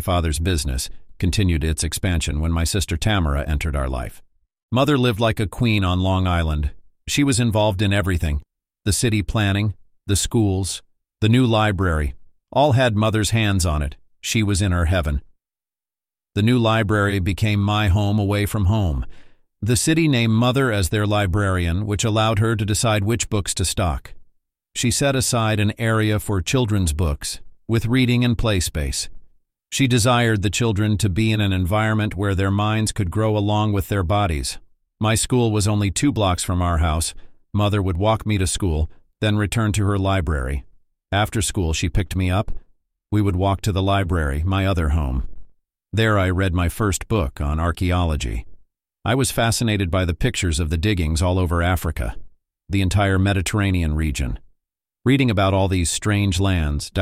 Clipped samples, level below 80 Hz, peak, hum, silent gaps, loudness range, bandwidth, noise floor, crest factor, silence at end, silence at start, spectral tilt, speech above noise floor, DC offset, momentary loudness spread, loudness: under 0.1%; -30 dBFS; -4 dBFS; none; 4.63-4.69 s; 3 LU; 15.5 kHz; under -90 dBFS; 16 dB; 0 s; 0 s; -5 dB/octave; over 71 dB; under 0.1%; 8 LU; -20 LUFS